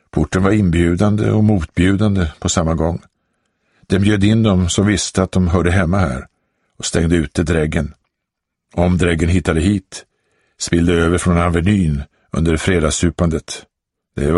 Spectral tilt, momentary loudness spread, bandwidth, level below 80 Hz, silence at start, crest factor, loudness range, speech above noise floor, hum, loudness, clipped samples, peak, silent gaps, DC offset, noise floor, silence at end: -6 dB/octave; 11 LU; 11.5 kHz; -30 dBFS; 0.15 s; 16 dB; 3 LU; 64 dB; none; -16 LUFS; under 0.1%; 0 dBFS; none; under 0.1%; -78 dBFS; 0 s